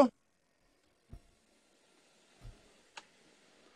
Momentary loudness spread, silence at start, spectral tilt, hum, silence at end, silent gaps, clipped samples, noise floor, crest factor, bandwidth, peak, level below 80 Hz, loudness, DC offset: 13 LU; 0 s; -6 dB/octave; none; 1.25 s; none; under 0.1%; -76 dBFS; 28 dB; 10 kHz; -12 dBFS; -64 dBFS; -37 LUFS; under 0.1%